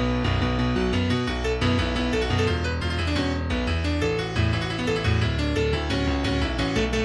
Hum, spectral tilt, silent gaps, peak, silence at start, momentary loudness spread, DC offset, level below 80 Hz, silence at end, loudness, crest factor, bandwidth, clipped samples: none; -6 dB/octave; none; -10 dBFS; 0 s; 2 LU; under 0.1%; -32 dBFS; 0 s; -24 LUFS; 12 dB; 11.5 kHz; under 0.1%